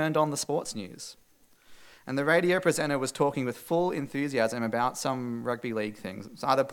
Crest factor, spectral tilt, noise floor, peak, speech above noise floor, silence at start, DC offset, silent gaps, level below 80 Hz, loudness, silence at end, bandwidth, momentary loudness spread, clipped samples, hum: 20 dB; -4.5 dB/octave; -58 dBFS; -8 dBFS; 29 dB; 0 s; under 0.1%; none; -68 dBFS; -29 LUFS; 0 s; 18 kHz; 14 LU; under 0.1%; none